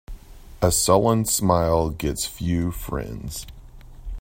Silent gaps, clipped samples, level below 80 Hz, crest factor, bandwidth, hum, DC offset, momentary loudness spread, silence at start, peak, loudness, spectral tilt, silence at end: none; under 0.1%; -36 dBFS; 20 dB; 16.5 kHz; none; under 0.1%; 16 LU; 0.1 s; -2 dBFS; -22 LUFS; -5 dB/octave; 0 s